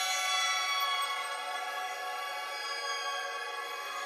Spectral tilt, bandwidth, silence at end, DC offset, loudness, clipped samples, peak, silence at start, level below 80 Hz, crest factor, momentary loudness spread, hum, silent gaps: 4.5 dB/octave; 15 kHz; 0 s; under 0.1%; -33 LUFS; under 0.1%; -18 dBFS; 0 s; under -90 dBFS; 16 dB; 8 LU; none; none